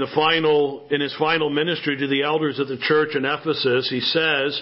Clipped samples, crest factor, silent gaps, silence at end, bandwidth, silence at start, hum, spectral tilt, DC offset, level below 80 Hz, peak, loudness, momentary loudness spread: under 0.1%; 16 dB; none; 0 s; 5.8 kHz; 0 s; none; -9 dB/octave; under 0.1%; -64 dBFS; -4 dBFS; -20 LUFS; 5 LU